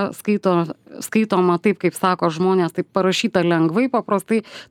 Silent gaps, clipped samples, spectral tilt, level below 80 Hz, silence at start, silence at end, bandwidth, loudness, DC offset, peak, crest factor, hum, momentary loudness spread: none; under 0.1%; -6 dB/octave; -66 dBFS; 0 s; 0.05 s; 17 kHz; -19 LUFS; under 0.1%; -2 dBFS; 16 dB; none; 5 LU